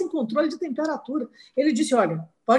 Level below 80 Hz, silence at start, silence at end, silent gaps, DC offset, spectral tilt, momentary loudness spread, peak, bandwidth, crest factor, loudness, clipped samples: -72 dBFS; 0 s; 0 s; none; under 0.1%; -5.5 dB/octave; 9 LU; -6 dBFS; 11.5 kHz; 18 dB; -25 LUFS; under 0.1%